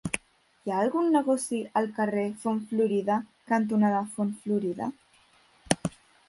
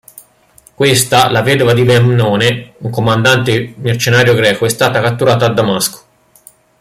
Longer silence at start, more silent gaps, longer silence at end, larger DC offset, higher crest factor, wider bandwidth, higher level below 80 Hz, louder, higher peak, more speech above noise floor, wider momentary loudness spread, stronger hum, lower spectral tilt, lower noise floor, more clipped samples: second, 0.05 s vs 0.8 s; neither; second, 0.4 s vs 0.85 s; neither; first, 22 dB vs 12 dB; second, 11.5 kHz vs 16 kHz; second, -64 dBFS vs -46 dBFS; second, -28 LUFS vs -11 LUFS; second, -6 dBFS vs 0 dBFS; about the same, 35 dB vs 36 dB; about the same, 9 LU vs 7 LU; neither; about the same, -5.5 dB/octave vs -4.5 dB/octave; first, -62 dBFS vs -47 dBFS; neither